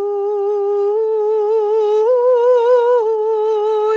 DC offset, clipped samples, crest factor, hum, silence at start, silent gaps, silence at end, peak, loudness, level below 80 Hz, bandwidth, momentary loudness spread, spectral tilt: under 0.1%; under 0.1%; 10 dB; none; 0 s; none; 0 s; -4 dBFS; -15 LUFS; -70 dBFS; 6.8 kHz; 5 LU; -3.5 dB/octave